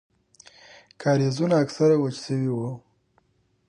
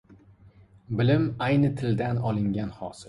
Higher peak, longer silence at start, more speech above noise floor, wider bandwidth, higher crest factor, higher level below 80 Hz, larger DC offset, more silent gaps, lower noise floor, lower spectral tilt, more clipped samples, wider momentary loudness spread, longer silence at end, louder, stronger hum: about the same, -8 dBFS vs -10 dBFS; first, 1 s vs 0.1 s; first, 44 dB vs 29 dB; about the same, 10.5 kHz vs 11 kHz; about the same, 16 dB vs 16 dB; second, -68 dBFS vs -52 dBFS; neither; neither; first, -66 dBFS vs -54 dBFS; about the same, -7 dB/octave vs -8 dB/octave; neither; about the same, 10 LU vs 9 LU; first, 0.9 s vs 0 s; about the same, -24 LUFS vs -26 LUFS; neither